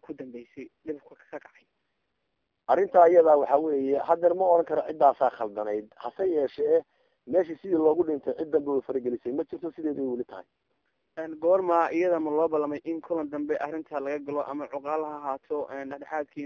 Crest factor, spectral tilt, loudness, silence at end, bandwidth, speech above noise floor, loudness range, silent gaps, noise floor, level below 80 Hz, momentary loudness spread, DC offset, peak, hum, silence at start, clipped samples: 20 dB; -8 dB/octave; -26 LUFS; 0 s; 6.6 kHz; 53 dB; 9 LU; none; -79 dBFS; -72 dBFS; 18 LU; under 0.1%; -6 dBFS; none; 0.1 s; under 0.1%